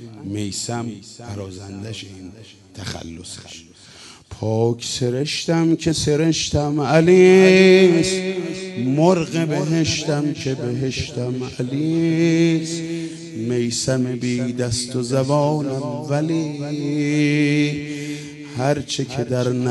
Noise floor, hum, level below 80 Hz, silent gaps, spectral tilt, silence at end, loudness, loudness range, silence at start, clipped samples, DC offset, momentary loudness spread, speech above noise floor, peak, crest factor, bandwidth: -43 dBFS; none; -50 dBFS; none; -5.5 dB/octave; 0 s; -19 LUFS; 14 LU; 0 s; under 0.1%; under 0.1%; 18 LU; 24 dB; -2 dBFS; 18 dB; 11.5 kHz